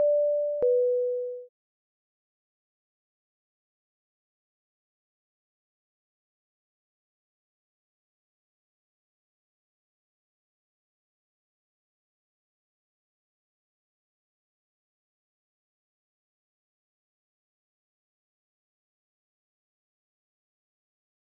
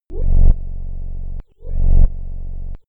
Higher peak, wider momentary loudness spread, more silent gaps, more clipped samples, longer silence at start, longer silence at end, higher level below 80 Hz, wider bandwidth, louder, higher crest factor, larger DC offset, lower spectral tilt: second, -16 dBFS vs -2 dBFS; second, 12 LU vs 15 LU; neither; neither; about the same, 0 s vs 0.1 s; first, 19.8 s vs 0.1 s; second, -84 dBFS vs -16 dBFS; first, 1.1 kHz vs 0.9 kHz; second, -26 LUFS vs -23 LUFS; first, 20 dB vs 12 dB; neither; second, 2.5 dB/octave vs -13 dB/octave